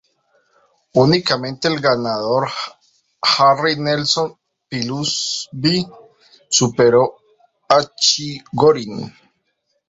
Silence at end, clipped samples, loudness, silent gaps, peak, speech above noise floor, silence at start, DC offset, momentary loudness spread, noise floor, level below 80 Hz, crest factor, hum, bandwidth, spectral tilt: 0.8 s; under 0.1%; -17 LUFS; none; 0 dBFS; 52 dB; 0.95 s; under 0.1%; 13 LU; -69 dBFS; -56 dBFS; 18 dB; none; 8 kHz; -3.5 dB/octave